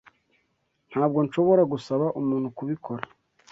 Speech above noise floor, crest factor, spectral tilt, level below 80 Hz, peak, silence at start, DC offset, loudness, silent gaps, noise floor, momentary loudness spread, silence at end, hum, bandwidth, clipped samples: 49 dB; 18 dB; -8.5 dB/octave; -68 dBFS; -8 dBFS; 0.9 s; under 0.1%; -25 LUFS; none; -73 dBFS; 14 LU; 0.45 s; none; 7.8 kHz; under 0.1%